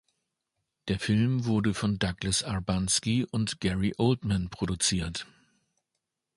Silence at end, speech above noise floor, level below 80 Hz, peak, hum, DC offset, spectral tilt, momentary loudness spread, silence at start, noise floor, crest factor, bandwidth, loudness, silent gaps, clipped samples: 1.15 s; 56 dB; -48 dBFS; -10 dBFS; none; under 0.1%; -4.5 dB/octave; 7 LU; 0.85 s; -84 dBFS; 20 dB; 11.5 kHz; -28 LUFS; none; under 0.1%